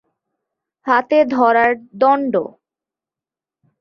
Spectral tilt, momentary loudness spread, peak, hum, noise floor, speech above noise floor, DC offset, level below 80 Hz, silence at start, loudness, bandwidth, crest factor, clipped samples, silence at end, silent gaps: -6.5 dB/octave; 10 LU; -2 dBFS; none; -89 dBFS; 74 dB; under 0.1%; -64 dBFS; 0.85 s; -16 LUFS; 6.6 kHz; 16 dB; under 0.1%; 1.3 s; none